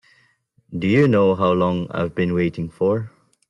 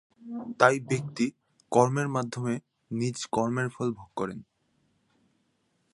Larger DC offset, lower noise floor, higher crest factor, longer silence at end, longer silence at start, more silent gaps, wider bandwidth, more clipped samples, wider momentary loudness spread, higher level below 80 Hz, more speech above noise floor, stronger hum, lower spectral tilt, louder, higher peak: neither; second, -61 dBFS vs -73 dBFS; second, 16 dB vs 26 dB; second, 0.4 s vs 1.5 s; first, 0.7 s vs 0.2 s; neither; second, 9.4 kHz vs 11.5 kHz; neither; second, 10 LU vs 14 LU; first, -54 dBFS vs -68 dBFS; about the same, 42 dB vs 45 dB; neither; first, -8.5 dB/octave vs -5.5 dB/octave; first, -20 LUFS vs -28 LUFS; about the same, -6 dBFS vs -4 dBFS